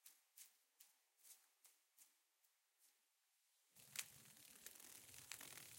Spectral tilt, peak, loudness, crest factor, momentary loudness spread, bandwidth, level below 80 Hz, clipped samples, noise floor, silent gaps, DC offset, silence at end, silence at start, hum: 0 dB/octave; -28 dBFS; -58 LUFS; 36 dB; 14 LU; 17 kHz; under -90 dBFS; under 0.1%; -85 dBFS; none; under 0.1%; 0 s; 0 s; none